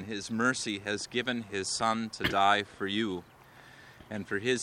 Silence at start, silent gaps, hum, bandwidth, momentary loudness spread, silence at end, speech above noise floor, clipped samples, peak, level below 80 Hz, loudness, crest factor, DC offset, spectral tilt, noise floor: 0 s; none; none; 16.5 kHz; 9 LU; 0 s; 23 dB; under 0.1%; -10 dBFS; -62 dBFS; -31 LUFS; 22 dB; under 0.1%; -3.5 dB/octave; -54 dBFS